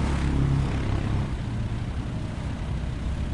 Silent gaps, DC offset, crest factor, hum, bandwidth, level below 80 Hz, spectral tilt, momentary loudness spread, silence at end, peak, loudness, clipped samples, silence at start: none; under 0.1%; 14 dB; none; 11 kHz; -30 dBFS; -7 dB/octave; 7 LU; 0 s; -14 dBFS; -28 LUFS; under 0.1%; 0 s